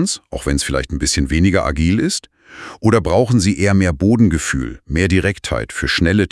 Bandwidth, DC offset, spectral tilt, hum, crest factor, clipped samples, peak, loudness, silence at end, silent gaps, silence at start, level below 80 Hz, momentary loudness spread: 12 kHz; under 0.1%; -5 dB/octave; none; 16 dB; under 0.1%; 0 dBFS; -16 LUFS; 0.05 s; none; 0 s; -30 dBFS; 8 LU